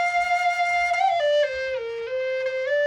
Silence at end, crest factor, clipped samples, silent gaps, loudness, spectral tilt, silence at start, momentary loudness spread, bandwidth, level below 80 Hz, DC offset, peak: 0 s; 10 dB; under 0.1%; none; -23 LUFS; -0.5 dB/octave; 0 s; 7 LU; 15.5 kHz; -60 dBFS; under 0.1%; -12 dBFS